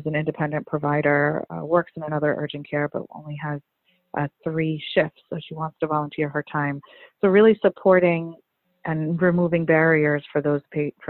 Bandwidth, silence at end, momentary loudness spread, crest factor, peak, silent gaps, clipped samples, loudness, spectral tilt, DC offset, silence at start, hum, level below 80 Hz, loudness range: 4.3 kHz; 0 s; 15 LU; 18 dB; -4 dBFS; none; under 0.1%; -22 LUFS; -11 dB/octave; under 0.1%; 0 s; none; -62 dBFS; 7 LU